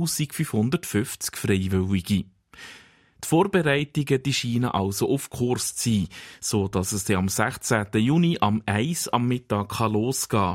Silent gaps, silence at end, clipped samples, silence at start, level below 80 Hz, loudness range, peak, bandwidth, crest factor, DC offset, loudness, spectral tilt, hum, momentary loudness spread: none; 0 s; under 0.1%; 0 s; -54 dBFS; 2 LU; -6 dBFS; 16.5 kHz; 18 dB; under 0.1%; -24 LUFS; -5 dB/octave; none; 7 LU